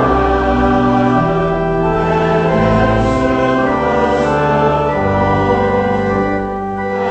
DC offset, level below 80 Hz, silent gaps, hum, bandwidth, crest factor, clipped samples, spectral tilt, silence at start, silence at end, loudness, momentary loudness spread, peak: under 0.1%; -28 dBFS; none; none; 8.6 kHz; 12 dB; under 0.1%; -7.5 dB/octave; 0 s; 0 s; -14 LUFS; 3 LU; 0 dBFS